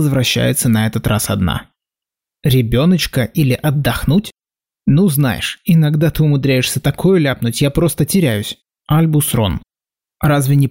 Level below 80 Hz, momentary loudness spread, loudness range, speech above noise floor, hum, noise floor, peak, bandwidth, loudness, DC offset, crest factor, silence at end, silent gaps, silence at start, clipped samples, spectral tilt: -36 dBFS; 7 LU; 2 LU; over 76 dB; none; under -90 dBFS; -4 dBFS; 16.5 kHz; -15 LUFS; 0.2%; 10 dB; 0 s; none; 0 s; under 0.1%; -5.5 dB/octave